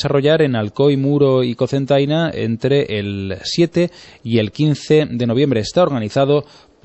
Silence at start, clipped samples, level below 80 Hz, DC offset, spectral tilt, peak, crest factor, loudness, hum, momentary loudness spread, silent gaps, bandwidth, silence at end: 0 s; under 0.1%; -50 dBFS; under 0.1%; -7 dB/octave; -2 dBFS; 14 dB; -17 LUFS; none; 6 LU; none; 8.4 kHz; 0.4 s